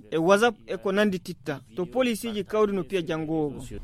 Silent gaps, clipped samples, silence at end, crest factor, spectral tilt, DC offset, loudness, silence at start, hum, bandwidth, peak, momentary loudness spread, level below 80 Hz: none; under 0.1%; 0 s; 20 dB; -5.5 dB/octave; under 0.1%; -26 LUFS; 0.05 s; none; 15.5 kHz; -6 dBFS; 12 LU; -52 dBFS